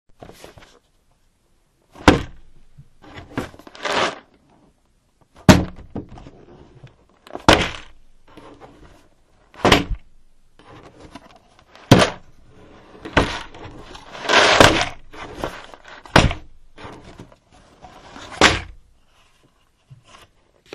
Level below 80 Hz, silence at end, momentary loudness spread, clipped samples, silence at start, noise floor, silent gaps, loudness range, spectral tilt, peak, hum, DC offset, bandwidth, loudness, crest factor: -36 dBFS; 2.1 s; 26 LU; under 0.1%; 2.05 s; -61 dBFS; none; 7 LU; -4.5 dB/octave; 0 dBFS; none; under 0.1%; 13.5 kHz; -17 LUFS; 22 dB